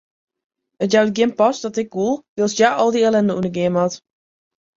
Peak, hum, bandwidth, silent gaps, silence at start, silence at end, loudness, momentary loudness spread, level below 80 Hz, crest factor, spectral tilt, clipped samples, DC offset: -2 dBFS; none; 7.8 kHz; 2.29-2.36 s; 0.8 s; 0.8 s; -18 LUFS; 8 LU; -60 dBFS; 18 dB; -5 dB/octave; under 0.1%; under 0.1%